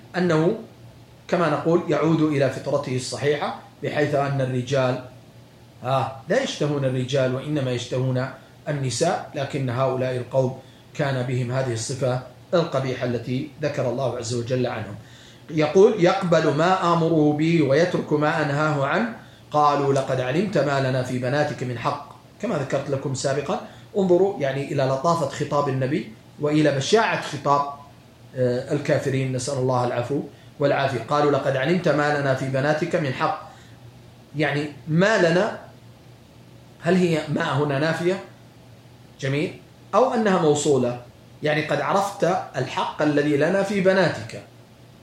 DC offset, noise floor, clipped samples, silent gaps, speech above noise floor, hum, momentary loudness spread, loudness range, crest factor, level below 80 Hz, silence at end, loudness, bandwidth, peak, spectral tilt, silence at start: under 0.1%; -48 dBFS; under 0.1%; none; 26 dB; none; 9 LU; 5 LU; 18 dB; -60 dBFS; 0.55 s; -23 LUFS; 12.5 kHz; -4 dBFS; -6 dB/octave; 0.05 s